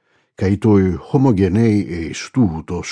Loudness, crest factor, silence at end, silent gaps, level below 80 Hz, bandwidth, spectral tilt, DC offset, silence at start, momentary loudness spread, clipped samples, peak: -17 LUFS; 14 dB; 0 s; none; -42 dBFS; 10.5 kHz; -7.5 dB/octave; under 0.1%; 0.4 s; 9 LU; under 0.1%; -2 dBFS